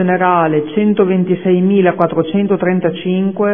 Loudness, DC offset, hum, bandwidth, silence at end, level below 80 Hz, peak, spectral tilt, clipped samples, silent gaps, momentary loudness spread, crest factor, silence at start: -14 LUFS; 0.6%; none; 3.6 kHz; 0 s; -56 dBFS; 0 dBFS; -11.5 dB/octave; under 0.1%; none; 4 LU; 12 dB; 0 s